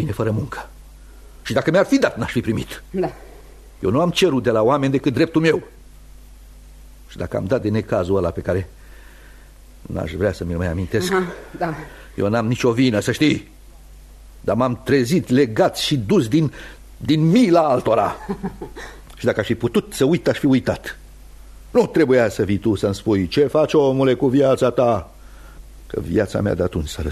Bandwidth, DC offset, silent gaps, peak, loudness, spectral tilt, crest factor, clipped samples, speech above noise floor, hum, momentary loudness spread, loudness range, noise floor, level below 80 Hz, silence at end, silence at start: 13.5 kHz; under 0.1%; none; -4 dBFS; -19 LUFS; -6.5 dB/octave; 16 dB; under 0.1%; 24 dB; none; 13 LU; 7 LU; -43 dBFS; -42 dBFS; 0 s; 0 s